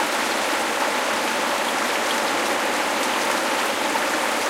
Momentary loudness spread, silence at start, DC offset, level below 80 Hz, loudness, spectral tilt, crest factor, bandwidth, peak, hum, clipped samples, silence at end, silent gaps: 1 LU; 0 s; under 0.1%; -62 dBFS; -21 LUFS; -1 dB/octave; 14 dB; 17 kHz; -8 dBFS; none; under 0.1%; 0 s; none